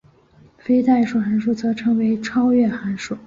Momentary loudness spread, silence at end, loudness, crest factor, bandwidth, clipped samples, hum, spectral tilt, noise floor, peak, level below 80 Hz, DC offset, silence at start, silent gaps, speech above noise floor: 7 LU; 0.1 s; -19 LUFS; 12 dB; 7.6 kHz; under 0.1%; none; -6.5 dB/octave; -51 dBFS; -6 dBFS; -56 dBFS; under 0.1%; 0.65 s; none; 33 dB